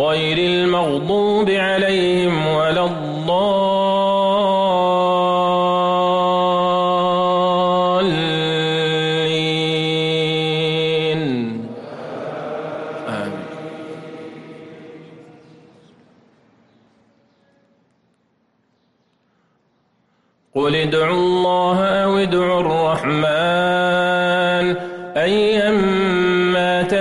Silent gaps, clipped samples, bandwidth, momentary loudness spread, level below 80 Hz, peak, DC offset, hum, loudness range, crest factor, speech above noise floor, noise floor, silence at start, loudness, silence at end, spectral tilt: none; under 0.1%; 11.5 kHz; 12 LU; -54 dBFS; -8 dBFS; under 0.1%; none; 13 LU; 10 dB; 47 dB; -64 dBFS; 0 s; -17 LUFS; 0 s; -6 dB/octave